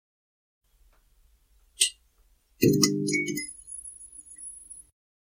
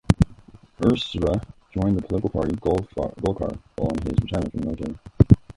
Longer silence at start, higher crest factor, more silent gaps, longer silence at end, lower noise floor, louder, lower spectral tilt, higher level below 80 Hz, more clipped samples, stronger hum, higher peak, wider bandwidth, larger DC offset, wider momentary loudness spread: first, 1.8 s vs 0.1 s; first, 28 dB vs 22 dB; neither; first, 0.45 s vs 0.05 s; first, -64 dBFS vs -48 dBFS; about the same, -26 LUFS vs -24 LUFS; second, -3.5 dB/octave vs -8 dB/octave; second, -60 dBFS vs -34 dBFS; neither; neither; second, -4 dBFS vs 0 dBFS; first, 16.5 kHz vs 11.5 kHz; neither; first, 22 LU vs 8 LU